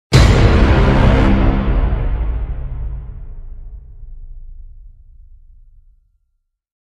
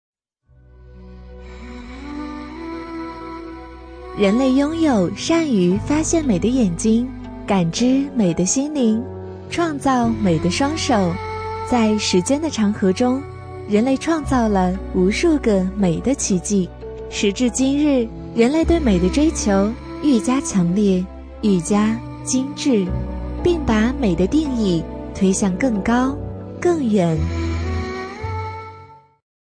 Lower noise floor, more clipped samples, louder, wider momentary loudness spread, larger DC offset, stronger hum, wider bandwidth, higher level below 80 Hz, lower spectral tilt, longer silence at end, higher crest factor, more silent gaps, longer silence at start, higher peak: first, -68 dBFS vs -55 dBFS; neither; first, -15 LUFS vs -19 LUFS; first, 25 LU vs 14 LU; neither; neither; about the same, 10.5 kHz vs 10.5 kHz; first, -18 dBFS vs -34 dBFS; about the same, -6.5 dB/octave vs -5.5 dB/octave; first, 1.95 s vs 0.5 s; about the same, 16 dB vs 16 dB; neither; second, 0.1 s vs 0.8 s; about the same, 0 dBFS vs -2 dBFS